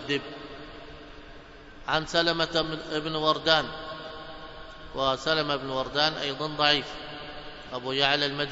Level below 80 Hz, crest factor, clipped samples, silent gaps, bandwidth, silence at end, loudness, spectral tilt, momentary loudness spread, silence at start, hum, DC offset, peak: -52 dBFS; 24 dB; under 0.1%; none; 8 kHz; 0 s; -26 LUFS; -4 dB/octave; 21 LU; 0 s; none; under 0.1%; -6 dBFS